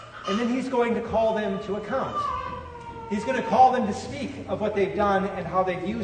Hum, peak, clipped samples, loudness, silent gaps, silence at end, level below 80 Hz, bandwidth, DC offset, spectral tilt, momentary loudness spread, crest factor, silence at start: none; -6 dBFS; under 0.1%; -25 LUFS; none; 0 s; -50 dBFS; 9.6 kHz; under 0.1%; -6 dB/octave; 13 LU; 18 dB; 0 s